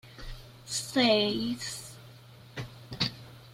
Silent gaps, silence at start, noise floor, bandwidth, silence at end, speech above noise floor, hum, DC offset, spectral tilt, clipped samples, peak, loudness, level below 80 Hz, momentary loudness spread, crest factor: none; 0.05 s; -51 dBFS; 16.5 kHz; 0 s; 24 dB; none; under 0.1%; -3.5 dB/octave; under 0.1%; -12 dBFS; -29 LUFS; -54 dBFS; 23 LU; 20 dB